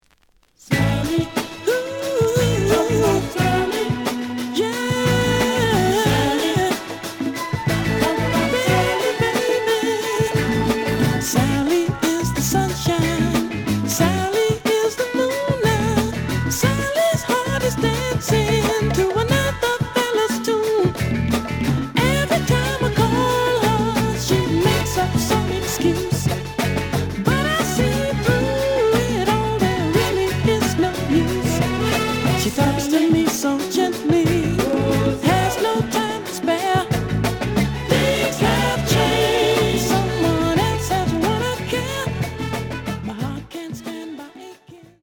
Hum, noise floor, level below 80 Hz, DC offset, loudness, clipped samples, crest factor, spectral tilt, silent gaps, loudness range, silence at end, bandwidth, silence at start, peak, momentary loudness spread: none; -58 dBFS; -36 dBFS; under 0.1%; -19 LUFS; under 0.1%; 18 dB; -5 dB/octave; none; 2 LU; 0.25 s; over 20 kHz; 0.65 s; -2 dBFS; 6 LU